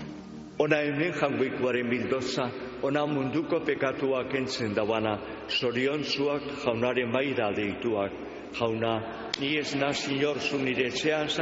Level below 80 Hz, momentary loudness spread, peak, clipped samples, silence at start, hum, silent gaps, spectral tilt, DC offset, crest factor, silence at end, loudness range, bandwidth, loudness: -60 dBFS; 5 LU; -8 dBFS; under 0.1%; 0 s; none; none; -3.5 dB/octave; under 0.1%; 20 dB; 0 s; 1 LU; 8 kHz; -28 LUFS